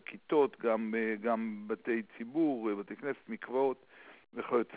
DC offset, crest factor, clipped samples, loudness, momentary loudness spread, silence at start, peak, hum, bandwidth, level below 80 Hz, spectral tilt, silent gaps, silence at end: under 0.1%; 16 dB; under 0.1%; -34 LUFS; 9 LU; 0.1 s; -18 dBFS; none; 4 kHz; -82 dBFS; -5 dB/octave; none; 0 s